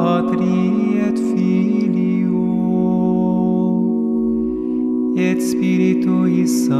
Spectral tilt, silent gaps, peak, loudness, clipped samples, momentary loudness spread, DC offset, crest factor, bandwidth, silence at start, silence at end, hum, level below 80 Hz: -7.5 dB/octave; none; -4 dBFS; -17 LUFS; under 0.1%; 3 LU; under 0.1%; 12 dB; 13 kHz; 0 s; 0 s; none; -48 dBFS